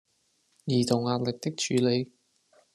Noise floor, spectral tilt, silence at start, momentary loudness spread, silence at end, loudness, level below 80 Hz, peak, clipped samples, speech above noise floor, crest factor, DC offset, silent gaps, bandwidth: -71 dBFS; -5.5 dB/octave; 0.65 s; 9 LU; 0.7 s; -27 LUFS; -66 dBFS; -8 dBFS; under 0.1%; 44 dB; 20 dB; under 0.1%; none; 13 kHz